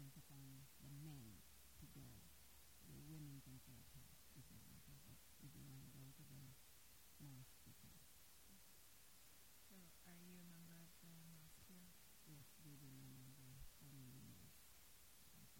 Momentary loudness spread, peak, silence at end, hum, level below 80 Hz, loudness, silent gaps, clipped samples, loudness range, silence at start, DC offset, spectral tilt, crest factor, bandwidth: 6 LU; -48 dBFS; 0 s; none; -76 dBFS; -63 LUFS; none; under 0.1%; 3 LU; 0 s; under 0.1%; -4 dB/octave; 16 dB; 16.5 kHz